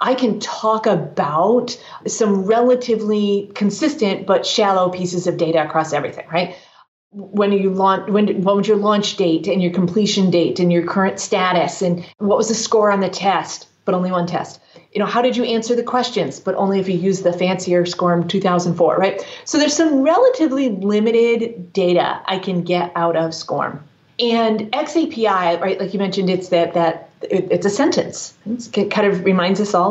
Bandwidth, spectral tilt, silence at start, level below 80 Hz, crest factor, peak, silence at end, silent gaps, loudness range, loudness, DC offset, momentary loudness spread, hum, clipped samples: 8.2 kHz; -5 dB/octave; 0 s; -70 dBFS; 12 dB; -4 dBFS; 0 s; 6.88-7.11 s; 3 LU; -18 LUFS; under 0.1%; 7 LU; none; under 0.1%